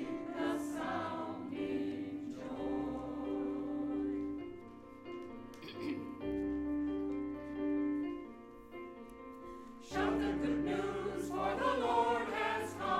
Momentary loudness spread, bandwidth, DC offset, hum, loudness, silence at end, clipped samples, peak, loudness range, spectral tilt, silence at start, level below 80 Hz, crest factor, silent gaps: 16 LU; 13.5 kHz; under 0.1%; none; -38 LUFS; 0 s; under 0.1%; -20 dBFS; 6 LU; -6 dB/octave; 0 s; -60 dBFS; 18 dB; none